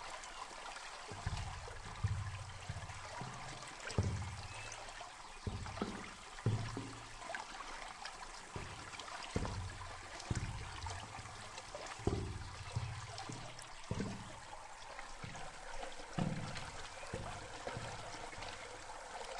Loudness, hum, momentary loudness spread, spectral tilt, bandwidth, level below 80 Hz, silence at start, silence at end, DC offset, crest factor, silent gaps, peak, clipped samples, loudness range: -46 LUFS; none; 8 LU; -4.5 dB/octave; 11.5 kHz; -54 dBFS; 0 s; 0 s; under 0.1%; 26 dB; none; -20 dBFS; under 0.1%; 2 LU